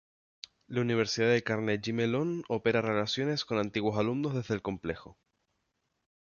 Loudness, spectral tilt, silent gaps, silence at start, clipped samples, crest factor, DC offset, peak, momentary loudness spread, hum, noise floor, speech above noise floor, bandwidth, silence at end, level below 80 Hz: -31 LUFS; -5.5 dB/octave; none; 0.7 s; under 0.1%; 18 dB; under 0.1%; -14 dBFS; 10 LU; none; -80 dBFS; 50 dB; 7.2 kHz; 1.25 s; -62 dBFS